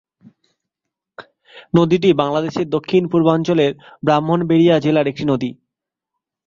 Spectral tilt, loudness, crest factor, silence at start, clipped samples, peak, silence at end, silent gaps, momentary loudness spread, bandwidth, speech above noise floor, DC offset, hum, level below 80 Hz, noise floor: -7.5 dB/octave; -17 LUFS; 16 dB; 1.2 s; under 0.1%; -2 dBFS; 0.95 s; none; 7 LU; 7.4 kHz; 67 dB; under 0.1%; none; -56 dBFS; -82 dBFS